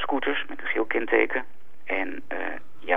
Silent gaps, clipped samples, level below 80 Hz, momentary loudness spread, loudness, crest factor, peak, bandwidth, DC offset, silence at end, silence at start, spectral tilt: none; under 0.1%; -70 dBFS; 14 LU; -27 LUFS; 22 dB; -4 dBFS; 4.2 kHz; 4%; 0 s; 0 s; -6 dB/octave